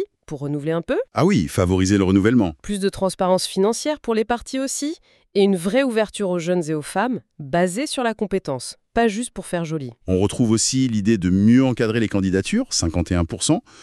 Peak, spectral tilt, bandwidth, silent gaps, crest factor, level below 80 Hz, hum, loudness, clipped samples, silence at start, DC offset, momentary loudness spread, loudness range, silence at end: -4 dBFS; -5 dB/octave; 13 kHz; none; 16 dB; -44 dBFS; none; -20 LUFS; under 0.1%; 0 s; under 0.1%; 9 LU; 4 LU; 0 s